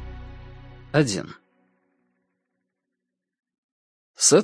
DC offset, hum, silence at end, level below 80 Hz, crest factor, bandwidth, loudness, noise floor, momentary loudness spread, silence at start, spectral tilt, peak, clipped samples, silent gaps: under 0.1%; none; 0 s; -50 dBFS; 22 dB; 10.5 kHz; -22 LUFS; -83 dBFS; 26 LU; 0 s; -3.5 dB/octave; -4 dBFS; under 0.1%; 3.58-4.14 s